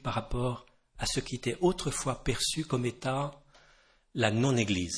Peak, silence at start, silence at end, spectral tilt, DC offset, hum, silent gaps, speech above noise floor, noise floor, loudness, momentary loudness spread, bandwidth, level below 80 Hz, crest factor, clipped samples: -8 dBFS; 0 s; 0 s; -4.5 dB/octave; under 0.1%; none; none; 33 dB; -63 dBFS; -31 LUFS; 8 LU; 11 kHz; -46 dBFS; 24 dB; under 0.1%